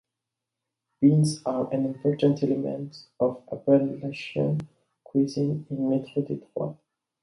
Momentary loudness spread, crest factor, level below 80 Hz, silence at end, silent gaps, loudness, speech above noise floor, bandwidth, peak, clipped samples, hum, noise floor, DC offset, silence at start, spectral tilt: 11 LU; 18 dB; -66 dBFS; 0.5 s; none; -26 LUFS; 61 dB; 11.5 kHz; -8 dBFS; under 0.1%; none; -86 dBFS; under 0.1%; 1 s; -7.5 dB/octave